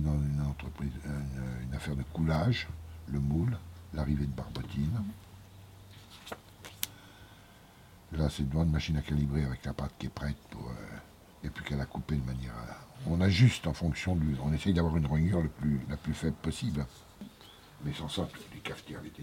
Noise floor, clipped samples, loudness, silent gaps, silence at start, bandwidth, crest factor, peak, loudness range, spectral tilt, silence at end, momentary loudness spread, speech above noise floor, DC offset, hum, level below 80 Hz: -56 dBFS; under 0.1%; -33 LUFS; none; 0 s; 16.5 kHz; 28 dB; -4 dBFS; 9 LU; -6.5 dB/octave; 0 s; 20 LU; 24 dB; under 0.1%; none; -44 dBFS